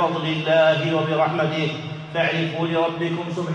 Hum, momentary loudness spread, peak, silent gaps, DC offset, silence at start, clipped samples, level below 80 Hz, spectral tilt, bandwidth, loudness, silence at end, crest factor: none; 9 LU; -6 dBFS; none; under 0.1%; 0 s; under 0.1%; -64 dBFS; -6.5 dB/octave; 8.8 kHz; -21 LUFS; 0 s; 16 dB